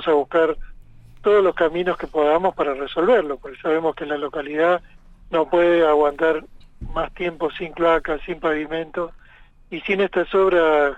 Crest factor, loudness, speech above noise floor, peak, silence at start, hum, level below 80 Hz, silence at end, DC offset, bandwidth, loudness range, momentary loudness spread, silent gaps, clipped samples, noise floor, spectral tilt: 14 dB; -20 LUFS; 28 dB; -6 dBFS; 0 s; none; -42 dBFS; 0 s; under 0.1%; 8 kHz; 4 LU; 11 LU; none; under 0.1%; -48 dBFS; -6.5 dB/octave